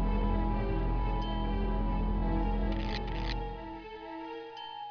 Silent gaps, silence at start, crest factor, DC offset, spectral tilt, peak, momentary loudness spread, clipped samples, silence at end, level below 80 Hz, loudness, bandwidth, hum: none; 0 s; 14 dB; under 0.1%; -8 dB/octave; -18 dBFS; 11 LU; under 0.1%; 0 s; -34 dBFS; -35 LUFS; 5.4 kHz; none